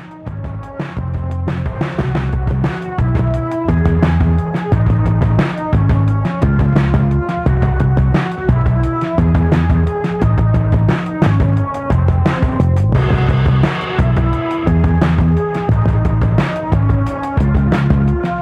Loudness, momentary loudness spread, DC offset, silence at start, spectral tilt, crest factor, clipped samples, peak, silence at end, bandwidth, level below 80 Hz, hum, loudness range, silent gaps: -15 LUFS; 6 LU; under 0.1%; 0 s; -9 dB/octave; 14 dB; under 0.1%; 0 dBFS; 0 s; 8 kHz; -22 dBFS; none; 2 LU; none